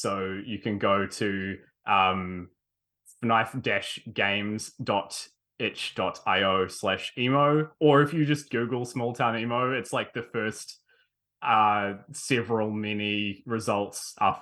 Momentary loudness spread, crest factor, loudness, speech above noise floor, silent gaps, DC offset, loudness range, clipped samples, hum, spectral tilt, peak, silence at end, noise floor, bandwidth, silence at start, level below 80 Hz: 11 LU; 20 dB; -27 LUFS; 54 dB; none; under 0.1%; 4 LU; under 0.1%; none; -5 dB/octave; -8 dBFS; 0 s; -81 dBFS; 12.5 kHz; 0 s; -70 dBFS